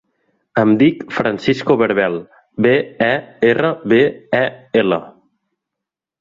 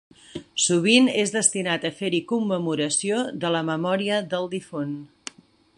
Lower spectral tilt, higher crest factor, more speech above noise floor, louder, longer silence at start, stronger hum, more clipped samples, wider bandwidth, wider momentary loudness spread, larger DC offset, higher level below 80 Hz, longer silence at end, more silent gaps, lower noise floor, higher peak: first, -7.5 dB/octave vs -3.5 dB/octave; about the same, 16 dB vs 20 dB; first, 68 dB vs 20 dB; first, -16 LUFS vs -23 LUFS; first, 0.55 s vs 0.35 s; neither; neither; second, 7.6 kHz vs 11.5 kHz; second, 6 LU vs 17 LU; neither; first, -56 dBFS vs -68 dBFS; first, 1.1 s vs 0.7 s; neither; first, -83 dBFS vs -43 dBFS; about the same, -2 dBFS vs -4 dBFS